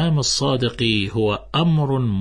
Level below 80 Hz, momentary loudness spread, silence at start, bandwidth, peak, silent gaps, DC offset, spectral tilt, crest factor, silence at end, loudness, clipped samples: -42 dBFS; 3 LU; 0 s; 10.5 kHz; -6 dBFS; none; under 0.1%; -5 dB/octave; 12 dB; 0 s; -19 LUFS; under 0.1%